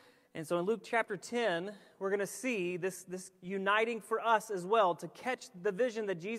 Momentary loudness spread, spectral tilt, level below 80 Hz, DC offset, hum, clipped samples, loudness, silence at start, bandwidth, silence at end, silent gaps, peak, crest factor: 11 LU; -4.5 dB/octave; -86 dBFS; under 0.1%; none; under 0.1%; -34 LUFS; 0.35 s; 15 kHz; 0 s; none; -14 dBFS; 20 dB